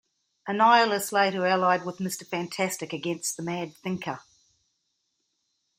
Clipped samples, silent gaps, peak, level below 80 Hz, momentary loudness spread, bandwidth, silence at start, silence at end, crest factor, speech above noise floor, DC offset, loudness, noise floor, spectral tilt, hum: under 0.1%; none; -6 dBFS; -74 dBFS; 13 LU; 16 kHz; 0.45 s; 1.6 s; 22 dB; 51 dB; under 0.1%; -26 LUFS; -77 dBFS; -3.5 dB/octave; none